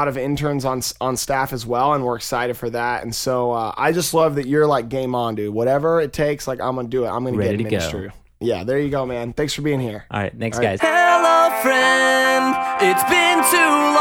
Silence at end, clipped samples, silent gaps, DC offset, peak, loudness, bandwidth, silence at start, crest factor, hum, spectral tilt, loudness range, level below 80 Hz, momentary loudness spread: 0 s; under 0.1%; none; under 0.1%; -2 dBFS; -18 LUFS; 19 kHz; 0 s; 18 dB; none; -4 dB/octave; 7 LU; -46 dBFS; 10 LU